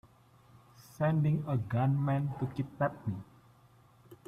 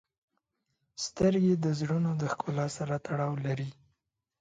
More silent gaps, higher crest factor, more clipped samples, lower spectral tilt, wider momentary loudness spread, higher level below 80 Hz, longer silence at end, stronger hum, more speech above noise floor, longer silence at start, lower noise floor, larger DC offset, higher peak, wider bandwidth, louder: neither; about the same, 14 dB vs 18 dB; neither; first, -9.5 dB/octave vs -6.5 dB/octave; about the same, 9 LU vs 11 LU; about the same, -64 dBFS vs -62 dBFS; second, 0.1 s vs 0.7 s; neither; second, 31 dB vs 51 dB; second, 0.8 s vs 1 s; second, -62 dBFS vs -81 dBFS; neither; second, -18 dBFS vs -14 dBFS; first, 13.5 kHz vs 9.4 kHz; about the same, -32 LUFS vs -30 LUFS